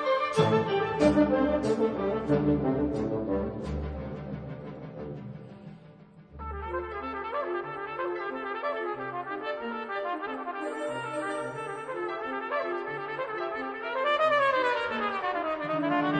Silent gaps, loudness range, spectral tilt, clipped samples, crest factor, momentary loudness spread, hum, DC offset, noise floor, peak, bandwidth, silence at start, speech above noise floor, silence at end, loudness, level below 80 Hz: none; 10 LU; -6.5 dB/octave; under 0.1%; 20 dB; 14 LU; none; under 0.1%; -52 dBFS; -10 dBFS; 10 kHz; 0 s; 27 dB; 0 s; -30 LUFS; -48 dBFS